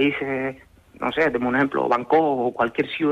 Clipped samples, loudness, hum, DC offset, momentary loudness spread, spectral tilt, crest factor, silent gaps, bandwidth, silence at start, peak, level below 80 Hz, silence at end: under 0.1%; -22 LUFS; none; under 0.1%; 8 LU; -7 dB/octave; 14 dB; none; 8.2 kHz; 0 s; -8 dBFS; -56 dBFS; 0 s